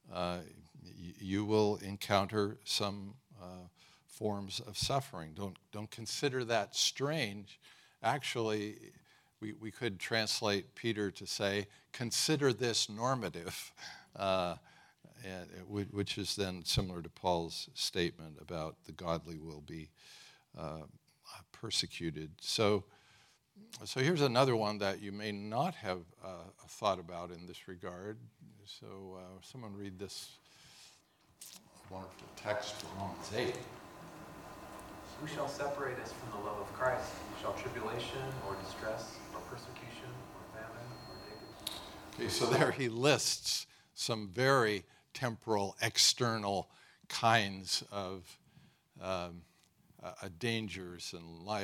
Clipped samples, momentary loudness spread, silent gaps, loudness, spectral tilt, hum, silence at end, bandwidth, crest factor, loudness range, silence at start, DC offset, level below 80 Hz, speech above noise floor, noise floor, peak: under 0.1%; 20 LU; none; -36 LUFS; -3.5 dB/octave; none; 0 s; 18 kHz; 26 dB; 13 LU; 0.05 s; under 0.1%; -66 dBFS; 31 dB; -68 dBFS; -12 dBFS